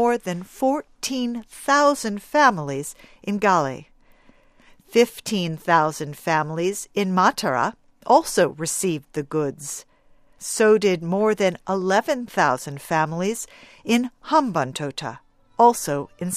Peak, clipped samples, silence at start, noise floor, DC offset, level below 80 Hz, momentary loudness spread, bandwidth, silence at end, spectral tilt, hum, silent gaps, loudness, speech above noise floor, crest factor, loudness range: -2 dBFS; under 0.1%; 0 s; -54 dBFS; under 0.1%; -58 dBFS; 13 LU; 15.5 kHz; 0 s; -4.5 dB/octave; none; none; -22 LUFS; 33 dB; 20 dB; 2 LU